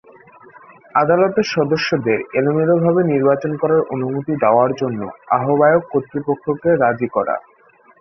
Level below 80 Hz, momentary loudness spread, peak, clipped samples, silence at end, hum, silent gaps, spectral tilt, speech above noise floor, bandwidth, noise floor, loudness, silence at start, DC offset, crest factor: -58 dBFS; 8 LU; -2 dBFS; under 0.1%; 0.6 s; none; none; -7 dB/octave; 34 dB; 6.4 kHz; -51 dBFS; -17 LUFS; 0.95 s; under 0.1%; 16 dB